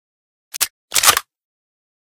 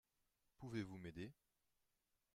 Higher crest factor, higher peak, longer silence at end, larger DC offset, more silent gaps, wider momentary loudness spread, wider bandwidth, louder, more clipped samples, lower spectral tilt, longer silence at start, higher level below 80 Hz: about the same, 22 dB vs 22 dB; first, 0 dBFS vs -34 dBFS; about the same, 0.9 s vs 1 s; neither; first, 0.70-0.88 s vs none; about the same, 10 LU vs 8 LU; first, over 20 kHz vs 15 kHz; first, -16 LUFS vs -53 LUFS; neither; second, 2 dB/octave vs -6.5 dB/octave; about the same, 0.55 s vs 0.6 s; first, -54 dBFS vs -78 dBFS